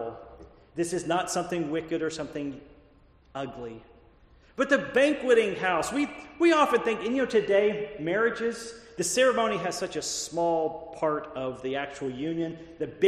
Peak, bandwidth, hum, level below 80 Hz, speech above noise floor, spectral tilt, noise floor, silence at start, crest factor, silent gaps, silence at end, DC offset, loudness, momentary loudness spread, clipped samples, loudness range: -8 dBFS; 13 kHz; none; -60 dBFS; 31 dB; -4 dB/octave; -58 dBFS; 0 s; 18 dB; none; 0 s; under 0.1%; -27 LUFS; 15 LU; under 0.1%; 8 LU